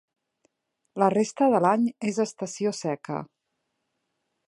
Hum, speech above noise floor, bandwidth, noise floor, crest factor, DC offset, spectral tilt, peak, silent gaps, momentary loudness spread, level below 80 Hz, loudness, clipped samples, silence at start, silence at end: none; 55 dB; 11.5 kHz; -79 dBFS; 20 dB; under 0.1%; -5.5 dB/octave; -6 dBFS; none; 12 LU; -74 dBFS; -25 LUFS; under 0.1%; 0.95 s; 1.25 s